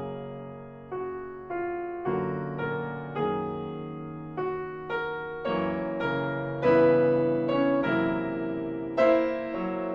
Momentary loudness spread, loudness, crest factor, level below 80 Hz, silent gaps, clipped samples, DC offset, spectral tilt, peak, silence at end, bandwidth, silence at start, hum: 14 LU; -28 LUFS; 18 dB; -58 dBFS; none; under 0.1%; under 0.1%; -9 dB/octave; -10 dBFS; 0 s; 6.6 kHz; 0 s; none